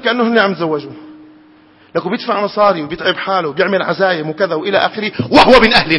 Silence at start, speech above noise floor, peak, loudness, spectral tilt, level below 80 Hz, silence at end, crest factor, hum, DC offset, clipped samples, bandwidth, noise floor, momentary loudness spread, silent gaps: 0 s; 32 dB; 0 dBFS; -13 LUFS; -5.5 dB/octave; -38 dBFS; 0 s; 14 dB; none; under 0.1%; 0.3%; 11 kHz; -46 dBFS; 12 LU; none